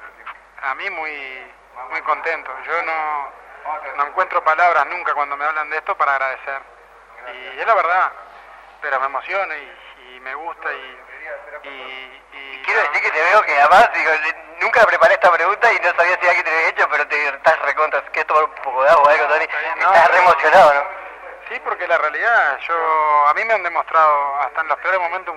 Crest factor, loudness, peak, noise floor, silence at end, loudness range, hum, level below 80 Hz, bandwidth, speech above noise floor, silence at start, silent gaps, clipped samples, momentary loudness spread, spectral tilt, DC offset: 18 dB; -16 LUFS; 0 dBFS; -43 dBFS; 0 s; 10 LU; none; -58 dBFS; 13 kHz; 26 dB; 0 s; none; under 0.1%; 20 LU; -2.5 dB/octave; under 0.1%